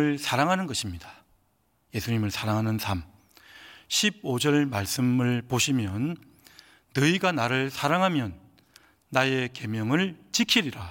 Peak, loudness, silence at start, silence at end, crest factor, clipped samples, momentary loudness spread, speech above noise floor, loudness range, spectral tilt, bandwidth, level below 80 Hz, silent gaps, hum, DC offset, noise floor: -4 dBFS; -26 LUFS; 0 s; 0 s; 22 dB; under 0.1%; 9 LU; 43 dB; 4 LU; -4.5 dB/octave; 17 kHz; -60 dBFS; none; none; under 0.1%; -69 dBFS